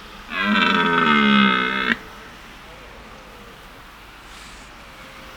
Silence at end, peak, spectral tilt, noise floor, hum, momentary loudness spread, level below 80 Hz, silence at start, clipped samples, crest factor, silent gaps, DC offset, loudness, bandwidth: 0 s; -2 dBFS; -5 dB/octave; -42 dBFS; none; 26 LU; -48 dBFS; 0 s; under 0.1%; 20 dB; none; under 0.1%; -17 LUFS; 17 kHz